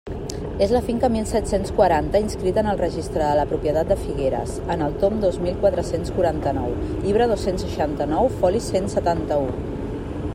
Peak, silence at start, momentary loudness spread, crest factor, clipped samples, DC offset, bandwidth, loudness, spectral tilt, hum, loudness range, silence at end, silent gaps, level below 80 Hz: -4 dBFS; 0.05 s; 7 LU; 18 dB; under 0.1%; under 0.1%; 16 kHz; -22 LUFS; -6.5 dB/octave; none; 1 LU; 0 s; none; -34 dBFS